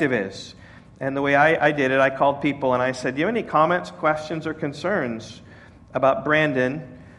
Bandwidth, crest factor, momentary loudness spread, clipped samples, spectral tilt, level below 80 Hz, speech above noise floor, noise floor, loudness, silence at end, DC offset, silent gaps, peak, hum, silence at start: 11.5 kHz; 18 dB; 14 LU; under 0.1%; -6 dB/octave; -56 dBFS; 25 dB; -46 dBFS; -22 LUFS; 0.05 s; under 0.1%; none; -4 dBFS; none; 0 s